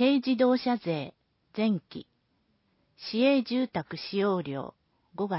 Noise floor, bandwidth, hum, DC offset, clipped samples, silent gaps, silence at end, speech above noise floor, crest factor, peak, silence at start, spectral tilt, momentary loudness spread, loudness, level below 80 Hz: -72 dBFS; 5.8 kHz; none; under 0.1%; under 0.1%; none; 0 s; 45 dB; 16 dB; -12 dBFS; 0 s; -10 dB/octave; 18 LU; -28 LUFS; -72 dBFS